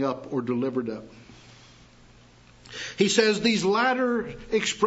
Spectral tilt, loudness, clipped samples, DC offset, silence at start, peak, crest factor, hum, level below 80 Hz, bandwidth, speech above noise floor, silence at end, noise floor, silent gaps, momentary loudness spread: -4 dB/octave; -25 LUFS; under 0.1%; under 0.1%; 0 s; -6 dBFS; 20 dB; none; -56 dBFS; 8 kHz; 29 dB; 0 s; -53 dBFS; none; 15 LU